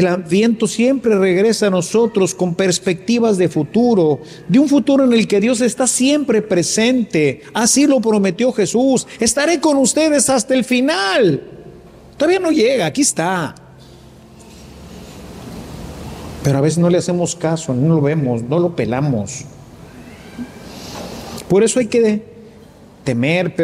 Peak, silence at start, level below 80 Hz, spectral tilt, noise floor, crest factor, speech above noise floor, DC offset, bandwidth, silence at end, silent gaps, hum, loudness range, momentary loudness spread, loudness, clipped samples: -2 dBFS; 0 s; -48 dBFS; -4.5 dB/octave; -42 dBFS; 14 dB; 27 dB; under 0.1%; 15.5 kHz; 0 s; none; none; 7 LU; 18 LU; -15 LUFS; under 0.1%